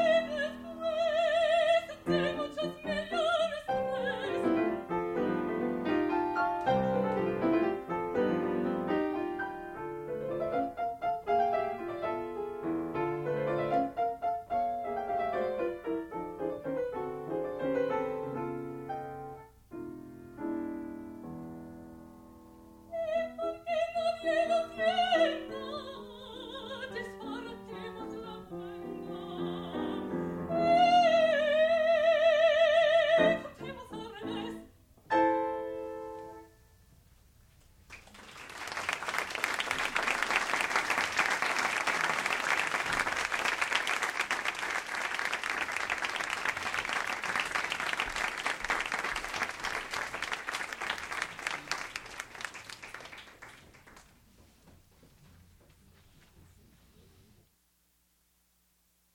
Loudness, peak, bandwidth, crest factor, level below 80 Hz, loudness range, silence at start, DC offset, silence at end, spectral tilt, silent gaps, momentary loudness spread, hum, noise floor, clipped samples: -31 LUFS; -12 dBFS; 16 kHz; 20 dB; -62 dBFS; 13 LU; 0 s; under 0.1%; 4.45 s; -4 dB/octave; none; 17 LU; none; -72 dBFS; under 0.1%